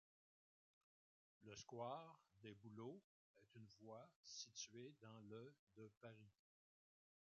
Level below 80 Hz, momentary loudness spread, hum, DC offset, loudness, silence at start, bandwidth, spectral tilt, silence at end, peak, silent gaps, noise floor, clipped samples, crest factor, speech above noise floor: under -90 dBFS; 12 LU; none; under 0.1%; -59 LUFS; 1.4 s; 7.2 kHz; -4 dB/octave; 1.05 s; -40 dBFS; 3.04-3.34 s, 4.16-4.23 s, 5.59-5.67 s, 5.97-6.01 s; under -90 dBFS; under 0.1%; 22 dB; over 31 dB